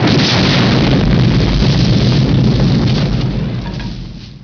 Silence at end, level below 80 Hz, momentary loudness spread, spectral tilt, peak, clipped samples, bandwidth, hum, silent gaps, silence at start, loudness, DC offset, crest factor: 0 s; -22 dBFS; 13 LU; -6.5 dB/octave; -2 dBFS; under 0.1%; 5.4 kHz; none; none; 0 s; -12 LUFS; under 0.1%; 10 dB